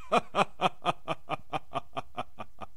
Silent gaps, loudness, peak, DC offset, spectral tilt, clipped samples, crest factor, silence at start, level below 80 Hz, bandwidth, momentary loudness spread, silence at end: none; -33 LUFS; -8 dBFS; 1%; -4.5 dB/octave; under 0.1%; 26 dB; 0 s; -62 dBFS; 14.5 kHz; 13 LU; 0.1 s